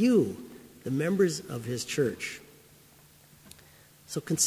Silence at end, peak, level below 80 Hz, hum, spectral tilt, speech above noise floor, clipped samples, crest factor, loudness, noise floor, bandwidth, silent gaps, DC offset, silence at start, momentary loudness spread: 0 s; -12 dBFS; -64 dBFS; none; -4.5 dB/octave; 29 dB; under 0.1%; 18 dB; -30 LUFS; -57 dBFS; 16 kHz; none; under 0.1%; 0 s; 25 LU